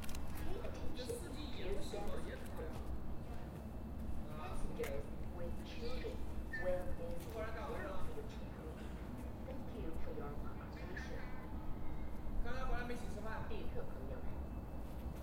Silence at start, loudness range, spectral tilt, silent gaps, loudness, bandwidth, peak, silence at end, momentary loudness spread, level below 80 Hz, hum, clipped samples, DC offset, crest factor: 0 s; 3 LU; -6 dB/octave; none; -47 LUFS; 16 kHz; -26 dBFS; 0 s; 5 LU; -48 dBFS; none; under 0.1%; under 0.1%; 16 dB